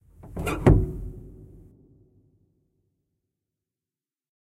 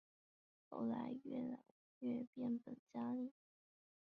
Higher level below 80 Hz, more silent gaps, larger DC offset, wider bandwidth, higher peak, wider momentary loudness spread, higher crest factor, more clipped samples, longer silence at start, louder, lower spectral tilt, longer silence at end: first, -36 dBFS vs -88 dBFS; second, none vs 1.71-2.01 s, 2.27-2.33 s, 2.79-2.87 s; neither; first, 13.5 kHz vs 4.6 kHz; first, -4 dBFS vs -34 dBFS; first, 24 LU vs 8 LU; first, 26 dB vs 14 dB; neither; second, 0.25 s vs 0.7 s; first, -23 LUFS vs -47 LUFS; about the same, -8 dB/octave vs -7.5 dB/octave; first, 3.1 s vs 0.85 s